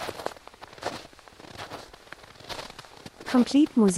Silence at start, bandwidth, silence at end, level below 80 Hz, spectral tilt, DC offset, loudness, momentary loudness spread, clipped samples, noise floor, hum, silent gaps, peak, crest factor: 0 s; 15 kHz; 0 s; -60 dBFS; -5 dB/octave; under 0.1%; -27 LUFS; 25 LU; under 0.1%; -48 dBFS; none; none; -10 dBFS; 18 dB